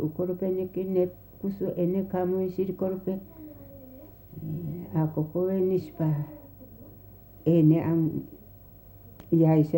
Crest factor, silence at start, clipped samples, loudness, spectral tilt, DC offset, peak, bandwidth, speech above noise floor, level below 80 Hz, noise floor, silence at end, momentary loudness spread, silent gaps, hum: 18 dB; 0 s; under 0.1%; -27 LUFS; -11 dB/octave; under 0.1%; -10 dBFS; 16 kHz; 24 dB; -58 dBFS; -50 dBFS; 0 s; 25 LU; none; none